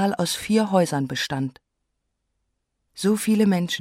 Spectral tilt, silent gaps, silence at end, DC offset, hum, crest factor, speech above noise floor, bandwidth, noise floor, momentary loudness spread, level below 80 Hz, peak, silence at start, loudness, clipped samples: -5 dB/octave; none; 0 s; under 0.1%; none; 18 dB; 55 dB; 16 kHz; -77 dBFS; 7 LU; -60 dBFS; -6 dBFS; 0 s; -22 LUFS; under 0.1%